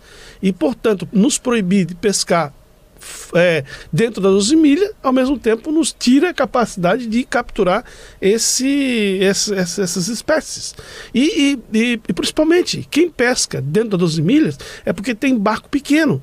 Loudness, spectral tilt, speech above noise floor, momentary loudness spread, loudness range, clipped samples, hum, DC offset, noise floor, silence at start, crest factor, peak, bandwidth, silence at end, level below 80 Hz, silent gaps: -16 LUFS; -4.5 dB/octave; 24 dB; 7 LU; 2 LU; under 0.1%; none; under 0.1%; -40 dBFS; 0.2 s; 12 dB; -4 dBFS; 15.5 kHz; 0 s; -44 dBFS; none